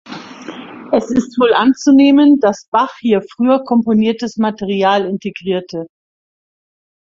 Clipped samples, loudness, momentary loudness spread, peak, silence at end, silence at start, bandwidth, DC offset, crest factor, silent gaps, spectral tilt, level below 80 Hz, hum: under 0.1%; -14 LUFS; 21 LU; 0 dBFS; 1.15 s; 0.05 s; 7.4 kHz; under 0.1%; 14 dB; 2.68-2.72 s; -6 dB/octave; -56 dBFS; none